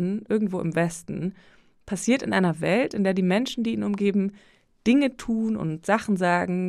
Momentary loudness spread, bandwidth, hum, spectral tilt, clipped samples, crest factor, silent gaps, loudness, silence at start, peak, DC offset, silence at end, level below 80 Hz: 8 LU; 13 kHz; none; -6 dB/octave; under 0.1%; 16 dB; none; -25 LUFS; 0 s; -8 dBFS; under 0.1%; 0 s; -58 dBFS